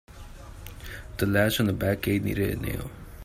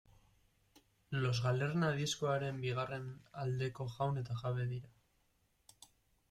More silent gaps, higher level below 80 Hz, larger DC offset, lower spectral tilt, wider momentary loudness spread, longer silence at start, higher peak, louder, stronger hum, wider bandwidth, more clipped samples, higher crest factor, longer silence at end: neither; first, -44 dBFS vs -68 dBFS; neither; about the same, -5.5 dB/octave vs -5.5 dB/octave; first, 21 LU vs 8 LU; second, 0.1 s vs 1.1 s; first, -8 dBFS vs -24 dBFS; first, -26 LUFS vs -38 LUFS; neither; first, 16 kHz vs 13 kHz; neither; about the same, 20 dB vs 16 dB; second, 0 s vs 1.4 s